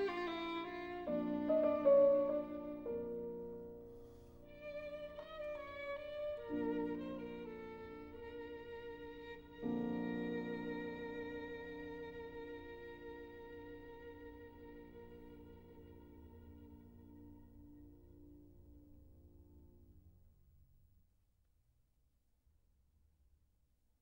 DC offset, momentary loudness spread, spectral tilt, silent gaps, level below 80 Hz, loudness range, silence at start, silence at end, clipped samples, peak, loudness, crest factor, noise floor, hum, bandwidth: under 0.1%; 22 LU; -7.5 dB/octave; none; -66 dBFS; 24 LU; 0 s; 3.45 s; under 0.1%; -20 dBFS; -41 LUFS; 22 dB; -77 dBFS; none; 16 kHz